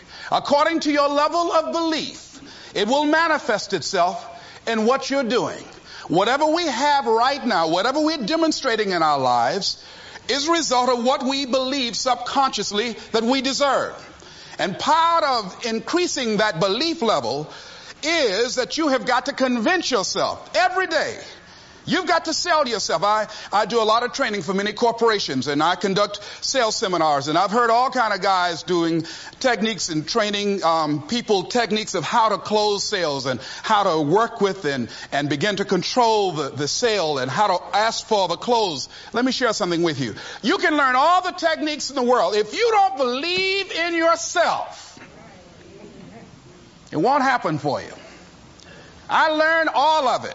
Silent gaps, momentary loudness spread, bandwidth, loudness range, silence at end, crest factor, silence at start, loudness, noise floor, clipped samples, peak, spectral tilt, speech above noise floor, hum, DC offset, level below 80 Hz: none; 9 LU; 8 kHz; 2 LU; 0 s; 16 dB; 0.1 s; -20 LUFS; -46 dBFS; under 0.1%; -6 dBFS; -3.5 dB/octave; 26 dB; none; under 0.1%; -58 dBFS